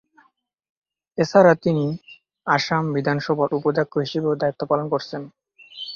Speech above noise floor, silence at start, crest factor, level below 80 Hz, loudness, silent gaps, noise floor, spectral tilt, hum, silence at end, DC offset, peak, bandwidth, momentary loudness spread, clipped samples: 43 dB; 1.15 s; 20 dB; -62 dBFS; -21 LUFS; none; -63 dBFS; -6.5 dB/octave; none; 0 s; under 0.1%; -2 dBFS; 7.2 kHz; 18 LU; under 0.1%